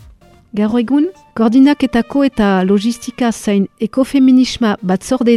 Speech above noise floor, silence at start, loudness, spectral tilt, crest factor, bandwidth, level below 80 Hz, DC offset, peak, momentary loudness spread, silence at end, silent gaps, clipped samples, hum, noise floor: 30 dB; 0.55 s; -14 LUFS; -6 dB/octave; 12 dB; 12.5 kHz; -42 dBFS; under 0.1%; 0 dBFS; 8 LU; 0 s; none; under 0.1%; none; -43 dBFS